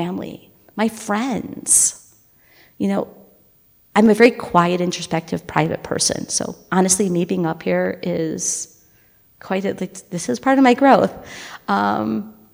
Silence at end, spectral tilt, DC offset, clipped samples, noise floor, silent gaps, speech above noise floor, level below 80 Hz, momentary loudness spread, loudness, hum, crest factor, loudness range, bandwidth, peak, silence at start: 0.2 s; -4 dB/octave; under 0.1%; under 0.1%; -55 dBFS; none; 36 dB; -56 dBFS; 14 LU; -18 LUFS; none; 20 dB; 3 LU; 16.5 kHz; 0 dBFS; 0 s